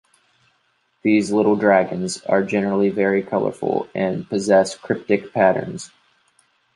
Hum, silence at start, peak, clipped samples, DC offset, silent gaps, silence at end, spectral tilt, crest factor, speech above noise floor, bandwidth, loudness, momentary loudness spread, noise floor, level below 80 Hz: none; 1.05 s; -2 dBFS; under 0.1%; under 0.1%; none; 0.9 s; -6 dB/octave; 18 dB; 47 dB; 11.5 kHz; -19 LUFS; 9 LU; -66 dBFS; -60 dBFS